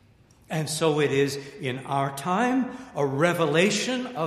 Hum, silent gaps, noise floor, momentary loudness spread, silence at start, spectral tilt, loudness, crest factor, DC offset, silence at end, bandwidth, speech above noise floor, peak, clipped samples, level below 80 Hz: none; none; -56 dBFS; 10 LU; 0.5 s; -4.5 dB/octave; -25 LUFS; 18 dB; under 0.1%; 0 s; 15.5 kHz; 32 dB; -6 dBFS; under 0.1%; -64 dBFS